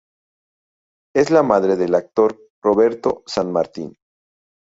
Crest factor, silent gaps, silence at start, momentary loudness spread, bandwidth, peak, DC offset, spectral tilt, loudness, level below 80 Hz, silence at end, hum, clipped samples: 18 dB; 2.50-2.62 s; 1.15 s; 8 LU; 7.8 kHz; -2 dBFS; under 0.1%; -6 dB/octave; -18 LUFS; -58 dBFS; 0.75 s; none; under 0.1%